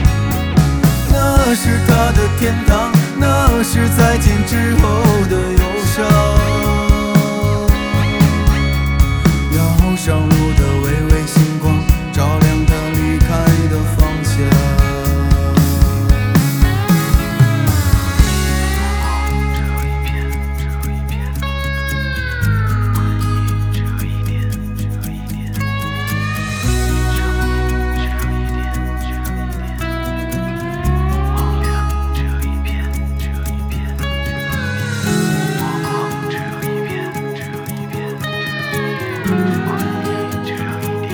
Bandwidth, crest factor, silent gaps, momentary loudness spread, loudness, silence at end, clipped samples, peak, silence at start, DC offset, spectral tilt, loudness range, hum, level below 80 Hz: over 20 kHz; 14 dB; none; 9 LU; -16 LUFS; 0 s; under 0.1%; 0 dBFS; 0 s; under 0.1%; -6 dB/octave; 7 LU; none; -20 dBFS